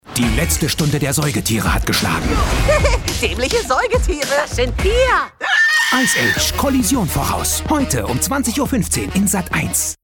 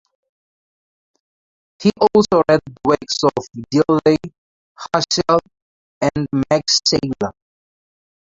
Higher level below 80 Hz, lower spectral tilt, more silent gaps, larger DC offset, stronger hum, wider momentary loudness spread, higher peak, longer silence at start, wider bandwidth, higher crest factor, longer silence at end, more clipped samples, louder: first, -26 dBFS vs -50 dBFS; about the same, -3.5 dB/octave vs -4.5 dB/octave; second, none vs 4.38-4.75 s, 5.62-6.01 s; neither; neither; second, 5 LU vs 9 LU; about the same, -2 dBFS vs -2 dBFS; second, 0.05 s vs 1.8 s; first, 17.5 kHz vs 7.8 kHz; about the same, 16 dB vs 18 dB; second, 0.1 s vs 1.05 s; neither; about the same, -16 LUFS vs -17 LUFS